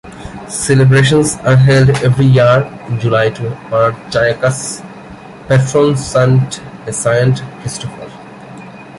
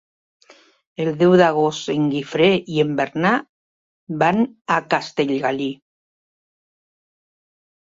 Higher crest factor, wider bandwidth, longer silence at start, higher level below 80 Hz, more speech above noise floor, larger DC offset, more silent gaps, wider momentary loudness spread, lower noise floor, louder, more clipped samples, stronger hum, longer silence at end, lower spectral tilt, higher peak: second, 12 dB vs 20 dB; first, 11.5 kHz vs 7.8 kHz; second, 0.05 s vs 1 s; first, -40 dBFS vs -62 dBFS; second, 21 dB vs over 72 dB; neither; second, none vs 3.49-4.07 s, 4.61-4.65 s; first, 23 LU vs 11 LU; second, -32 dBFS vs under -90 dBFS; first, -12 LUFS vs -19 LUFS; neither; neither; second, 0 s vs 2.2 s; about the same, -5.5 dB/octave vs -6 dB/octave; about the same, 0 dBFS vs 0 dBFS